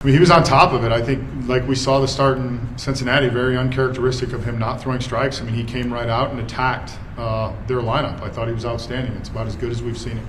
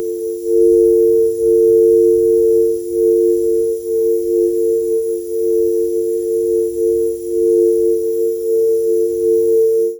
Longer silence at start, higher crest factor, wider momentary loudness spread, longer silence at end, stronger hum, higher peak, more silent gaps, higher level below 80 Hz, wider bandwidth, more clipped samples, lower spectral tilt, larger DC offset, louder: about the same, 0 s vs 0 s; first, 20 dB vs 10 dB; first, 12 LU vs 7 LU; about the same, 0 s vs 0 s; neither; first, 0 dBFS vs -4 dBFS; neither; first, -34 dBFS vs -48 dBFS; second, 11.5 kHz vs over 20 kHz; neither; about the same, -6 dB/octave vs -7 dB/octave; neither; second, -20 LUFS vs -14 LUFS